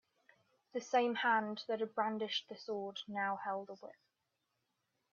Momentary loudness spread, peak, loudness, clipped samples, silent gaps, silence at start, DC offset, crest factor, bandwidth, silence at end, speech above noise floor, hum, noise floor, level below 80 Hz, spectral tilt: 13 LU; -20 dBFS; -38 LUFS; under 0.1%; none; 0.75 s; under 0.1%; 20 dB; 7.2 kHz; 1.2 s; 48 dB; none; -86 dBFS; under -90 dBFS; -4 dB/octave